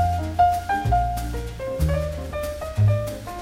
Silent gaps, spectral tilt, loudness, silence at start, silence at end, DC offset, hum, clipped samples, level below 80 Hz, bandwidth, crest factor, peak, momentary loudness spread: none; -6.5 dB/octave; -24 LUFS; 0 s; 0 s; under 0.1%; none; under 0.1%; -32 dBFS; 16 kHz; 14 dB; -8 dBFS; 10 LU